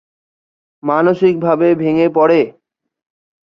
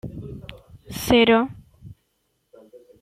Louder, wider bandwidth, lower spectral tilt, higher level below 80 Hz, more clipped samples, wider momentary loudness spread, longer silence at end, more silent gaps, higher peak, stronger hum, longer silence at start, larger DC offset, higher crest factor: first, -13 LUFS vs -19 LUFS; second, 6 kHz vs 16 kHz; first, -9 dB/octave vs -5 dB/octave; second, -60 dBFS vs -46 dBFS; neither; second, 7 LU vs 23 LU; about the same, 1 s vs 1.1 s; neither; about the same, -2 dBFS vs -4 dBFS; neither; first, 0.85 s vs 0.05 s; neither; second, 14 dB vs 20 dB